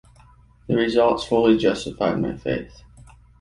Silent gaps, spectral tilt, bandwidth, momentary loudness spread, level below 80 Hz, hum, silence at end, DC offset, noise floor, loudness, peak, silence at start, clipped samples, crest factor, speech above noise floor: none; -6 dB/octave; 11 kHz; 10 LU; -48 dBFS; none; 0.7 s; under 0.1%; -51 dBFS; -21 LUFS; -4 dBFS; 0.7 s; under 0.1%; 18 dB; 31 dB